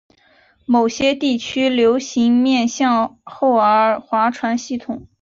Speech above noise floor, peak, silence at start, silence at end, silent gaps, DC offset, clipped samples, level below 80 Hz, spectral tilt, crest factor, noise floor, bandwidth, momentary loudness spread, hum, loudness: 38 dB; -4 dBFS; 0.7 s; 0.2 s; none; under 0.1%; under 0.1%; -56 dBFS; -4 dB/octave; 14 dB; -55 dBFS; 7.6 kHz; 10 LU; none; -17 LUFS